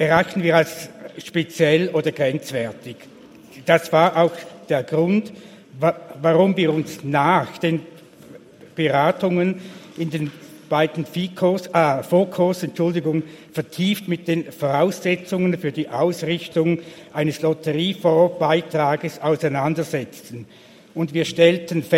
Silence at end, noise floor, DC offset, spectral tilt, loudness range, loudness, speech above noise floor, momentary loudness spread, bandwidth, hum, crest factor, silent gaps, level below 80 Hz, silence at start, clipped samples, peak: 0 s; -44 dBFS; under 0.1%; -6 dB/octave; 2 LU; -20 LUFS; 24 dB; 13 LU; 16.5 kHz; none; 20 dB; none; -64 dBFS; 0 s; under 0.1%; 0 dBFS